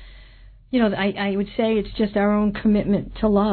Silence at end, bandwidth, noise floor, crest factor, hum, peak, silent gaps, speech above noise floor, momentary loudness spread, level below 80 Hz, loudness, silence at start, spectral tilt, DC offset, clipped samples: 0 s; 4.5 kHz; -46 dBFS; 16 dB; none; -6 dBFS; none; 26 dB; 4 LU; -40 dBFS; -21 LUFS; 0 s; -10.5 dB/octave; under 0.1%; under 0.1%